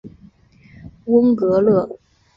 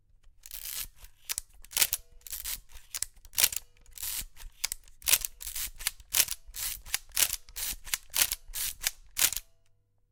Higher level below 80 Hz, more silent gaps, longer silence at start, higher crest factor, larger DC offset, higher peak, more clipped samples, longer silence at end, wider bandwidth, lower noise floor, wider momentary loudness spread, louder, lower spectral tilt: about the same, -52 dBFS vs -52 dBFS; neither; second, 0.05 s vs 0.25 s; second, 16 dB vs 34 dB; neither; about the same, -2 dBFS vs 0 dBFS; neither; second, 0.4 s vs 0.7 s; second, 5.4 kHz vs 19 kHz; second, -49 dBFS vs -66 dBFS; about the same, 14 LU vs 12 LU; first, -16 LUFS vs -30 LUFS; first, -10.5 dB/octave vs 2 dB/octave